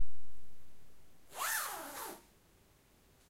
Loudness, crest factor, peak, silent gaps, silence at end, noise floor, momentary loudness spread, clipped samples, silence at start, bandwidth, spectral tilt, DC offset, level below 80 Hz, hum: -39 LUFS; 14 dB; -20 dBFS; none; 0 s; -67 dBFS; 18 LU; under 0.1%; 0 s; 16 kHz; -1 dB/octave; under 0.1%; -68 dBFS; none